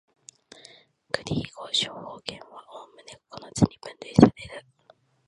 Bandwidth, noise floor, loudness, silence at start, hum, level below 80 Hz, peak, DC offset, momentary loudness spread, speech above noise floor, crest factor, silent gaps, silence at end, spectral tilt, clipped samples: 11 kHz; -61 dBFS; -25 LUFS; 1.15 s; none; -52 dBFS; 0 dBFS; under 0.1%; 26 LU; 32 dB; 26 dB; none; 0.7 s; -5.5 dB/octave; under 0.1%